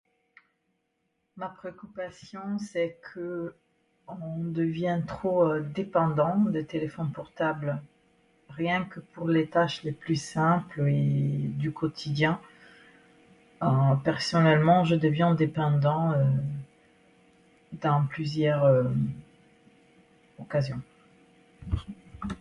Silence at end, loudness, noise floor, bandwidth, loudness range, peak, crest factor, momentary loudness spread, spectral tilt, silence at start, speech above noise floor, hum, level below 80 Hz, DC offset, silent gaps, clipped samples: 0.05 s; -27 LUFS; -77 dBFS; 11 kHz; 12 LU; -8 dBFS; 20 dB; 16 LU; -7.5 dB/octave; 1.35 s; 50 dB; none; -54 dBFS; under 0.1%; none; under 0.1%